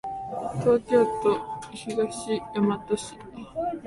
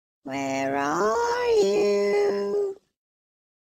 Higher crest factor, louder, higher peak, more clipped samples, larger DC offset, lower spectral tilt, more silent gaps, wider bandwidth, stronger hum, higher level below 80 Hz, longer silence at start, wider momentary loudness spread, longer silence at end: about the same, 18 dB vs 14 dB; about the same, -26 LUFS vs -24 LUFS; first, -8 dBFS vs -12 dBFS; neither; neither; first, -6 dB/octave vs -4.5 dB/octave; neither; second, 11.5 kHz vs 14 kHz; neither; first, -56 dBFS vs -62 dBFS; second, 0.05 s vs 0.25 s; first, 15 LU vs 8 LU; second, 0 s vs 0.85 s